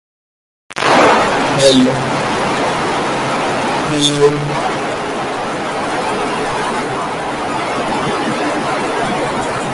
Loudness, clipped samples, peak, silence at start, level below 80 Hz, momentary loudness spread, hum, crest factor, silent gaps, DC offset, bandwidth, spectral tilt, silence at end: -15 LUFS; under 0.1%; 0 dBFS; 0.7 s; -44 dBFS; 9 LU; none; 16 dB; none; under 0.1%; 11.5 kHz; -4 dB/octave; 0 s